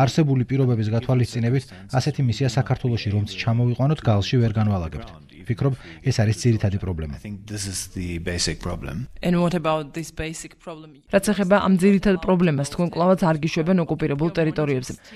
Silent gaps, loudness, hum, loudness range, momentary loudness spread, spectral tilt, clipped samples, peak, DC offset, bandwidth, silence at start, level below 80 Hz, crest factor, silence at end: none; -22 LUFS; none; 6 LU; 12 LU; -6.5 dB/octave; under 0.1%; -4 dBFS; under 0.1%; 13.5 kHz; 0 s; -42 dBFS; 18 dB; 0 s